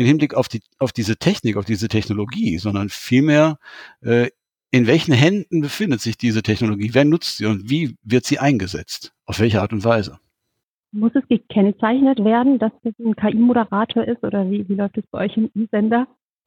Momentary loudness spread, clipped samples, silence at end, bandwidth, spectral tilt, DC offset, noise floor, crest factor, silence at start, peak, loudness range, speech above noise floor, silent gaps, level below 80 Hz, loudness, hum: 9 LU; under 0.1%; 0.4 s; 18.5 kHz; -6.5 dB/octave; under 0.1%; -78 dBFS; 18 dB; 0 s; -2 dBFS; 3 LU; 60 dB; 10.63-10.83 s; -52 dBFS; -19 LUFS; none